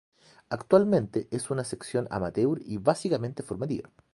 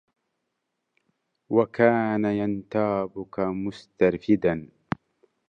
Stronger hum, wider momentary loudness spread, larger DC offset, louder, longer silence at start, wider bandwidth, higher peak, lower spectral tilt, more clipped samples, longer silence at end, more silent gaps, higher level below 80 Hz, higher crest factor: neither; about the same, 12 LU vs 14 LU; neither; second, -28 LUFS vs -25 LUFS; second, 0.5 s vs 1.5 s; first, 11.5 kHz vs 7.4 kHz; about the same, -6 dBFS vs -6 dBFS; second, -6.5 dB/octave vs -8.5 dB/octave; neither; second, 0.3 s vs 0.85 s; neither; about the same, -58 dBFS vs -58 dBFS; about the same, 22 dB vs 22 dB